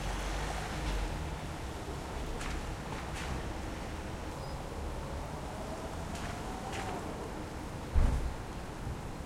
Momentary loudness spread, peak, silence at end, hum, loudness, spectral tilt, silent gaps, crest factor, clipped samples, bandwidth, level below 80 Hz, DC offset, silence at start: 5 LU; -14 dBFS; 0 s; none; -39 LUFS; -5 dB/octave; none; 22 dB; under 0.1%; 16 kHz; -40 dBFS; under 0.1%; 0 s